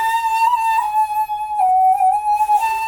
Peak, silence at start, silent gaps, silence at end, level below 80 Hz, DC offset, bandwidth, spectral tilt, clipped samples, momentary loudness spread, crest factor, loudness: -6 dBFS; 0 s; none; 0 s; -54 dBFS; under 0.1%; 17.5 kHz; 0 dB/octave; under 0.1%; 5 LU; 10 dB; -16 LUFS